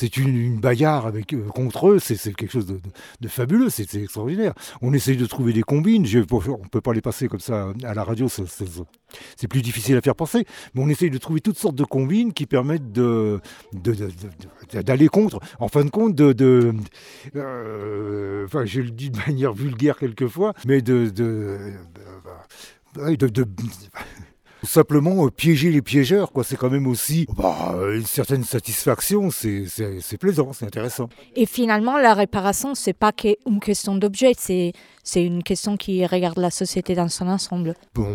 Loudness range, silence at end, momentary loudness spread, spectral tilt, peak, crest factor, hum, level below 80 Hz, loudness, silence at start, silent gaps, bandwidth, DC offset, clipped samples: 5 LU; 0 s; 13 LU; -6 dB/octave; 0 dBFS; 20 dB; none; -50 dBFS; -21 LUFS; 0 s; none; 19.5 kHz; under 0.1%; under 0.1%